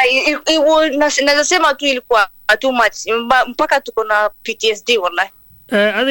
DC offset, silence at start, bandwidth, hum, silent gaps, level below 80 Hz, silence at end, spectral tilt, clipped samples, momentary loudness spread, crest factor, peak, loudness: under 0.1%; 0 s; 17.5 kHz; none; none; -50 dBFS; 0 s; -1.5 dB/octave; under 0.1%; 6 LU; 14 dB; -2 dBFS; -14 LUFS